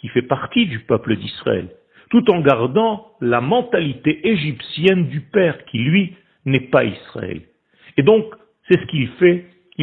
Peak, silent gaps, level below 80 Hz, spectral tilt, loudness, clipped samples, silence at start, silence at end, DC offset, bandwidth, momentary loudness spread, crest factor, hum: 0 dBFS; none; -54 dBFS; -9 dB/octave; -18 LUFS; under 0.1%; 0 s; 0 s; under 0.1%; 4.6 kHz; 12 LU; 18 dB; none